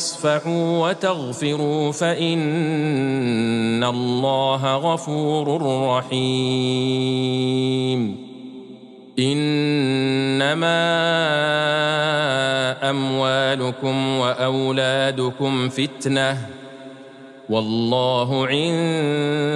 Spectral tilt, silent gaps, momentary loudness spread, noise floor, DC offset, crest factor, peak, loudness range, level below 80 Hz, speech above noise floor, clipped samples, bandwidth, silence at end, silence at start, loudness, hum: -5 dB/octave; none; 5 LU; -41 dBFS; under 0.1%; 14 dB; -6 dBFS; 3 LU; -66 dBFS; 21 dB; under 0.1%; 11.5 kHz; 0 s; 0 s; -20 LUFS; none